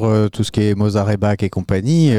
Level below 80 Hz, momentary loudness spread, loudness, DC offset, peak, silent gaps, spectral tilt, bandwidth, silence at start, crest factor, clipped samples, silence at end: -42 dBFS; 4 LU; -17 LUFS; 0.6%; -4 dBFS; none; -7.5 dB/octave; 11.5 kHz; 0 s; 12 dB; under 0.1%; 0 s